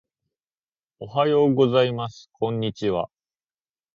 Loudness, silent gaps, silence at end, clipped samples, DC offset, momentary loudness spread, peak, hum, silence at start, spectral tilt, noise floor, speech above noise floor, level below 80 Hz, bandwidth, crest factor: -22 LUFS; none; 0.9 s; under 0.1%; under 0.1%; 15 LU; -6 dBFS; none; 1 s; -7.5 dB/octave; under -90 dBFS; over 68 dB; -60 dBFS; 7.2 kHz; 18 dB